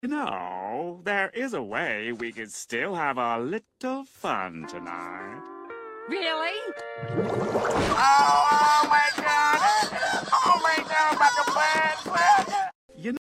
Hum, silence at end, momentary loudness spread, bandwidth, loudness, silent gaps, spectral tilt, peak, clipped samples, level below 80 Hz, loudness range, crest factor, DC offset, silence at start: none; 0.05 s; 16 LU; 15.5 kHz; -24 LUFS; 12.75-12.89 s; -3 dB/octave; -10 dBFS; under 0.1%; -58 dBFS; 11 LU; 16 dB; under 0.1%; 0.05 s